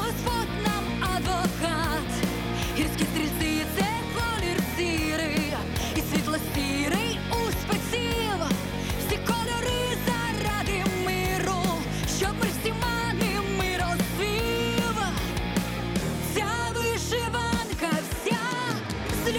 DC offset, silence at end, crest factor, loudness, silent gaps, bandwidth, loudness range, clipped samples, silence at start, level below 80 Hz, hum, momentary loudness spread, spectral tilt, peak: under 0.1%; 0 s; 14 dB; -27 LUFS; none; 17.5 kHz; 1 LU; under 0.1%; 0 s; -38 dBFS; none; 2 LU; -4.5 dB/octave; -12 dBFS